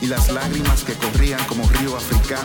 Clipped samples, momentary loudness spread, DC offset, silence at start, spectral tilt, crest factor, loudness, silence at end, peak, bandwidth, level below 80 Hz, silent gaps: under 0.1%; 2 LU; under 0.1%; 0 s; -4.5 dB/octave; 12 dB; -20 LUFS; 0 s; -6 dBFS; 19 kHz; -20 dBFS; none